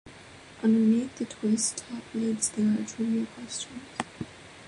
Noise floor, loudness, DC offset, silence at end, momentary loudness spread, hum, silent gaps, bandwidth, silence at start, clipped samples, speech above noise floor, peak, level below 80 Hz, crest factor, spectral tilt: -49 dBFS; -28 LUFS; under 0.1%; 0 s; 17 LU; none; none; 11.5 kHz; 0.05 s; under 0.1%; 21 dB; -10 dBFS; -64 dBFS; 18 dB; -4.5 dB/octave